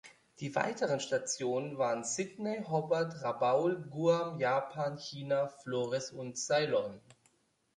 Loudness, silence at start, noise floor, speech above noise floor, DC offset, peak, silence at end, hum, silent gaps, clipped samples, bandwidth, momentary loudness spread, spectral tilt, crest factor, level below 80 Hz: -34 LUFS; 0.05 s; -72 dBFS; 39 dB; under 0.1%; -14 dBFS; 0.8 s; none; none; under 0.1%; 11 kHz; 7 LU; -4.5 dB/octave; 20 dB; -78 dBFS